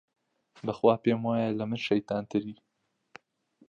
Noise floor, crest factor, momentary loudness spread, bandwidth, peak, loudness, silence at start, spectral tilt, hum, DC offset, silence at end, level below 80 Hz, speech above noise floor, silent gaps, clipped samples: -66 dBFS; 22 dB; 12 LU; 7.4 kHz; -10 dBFS; -29 LUFS; 0.65 s; -7.5 dB/octave; none; under 0.1%; 1.15 s; -70 dBFS; 38 dB; none; under 0.1%